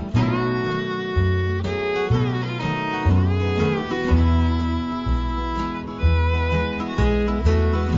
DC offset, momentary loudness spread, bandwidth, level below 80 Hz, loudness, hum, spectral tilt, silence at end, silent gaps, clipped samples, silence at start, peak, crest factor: under 0.1%; 5 LU; 7.4 kHz; -26 dBFS; -22 LUFS; none; -8 dB/octave; 0 s; none; under 0.1%; 0 s; -6 dBFS; 14 dB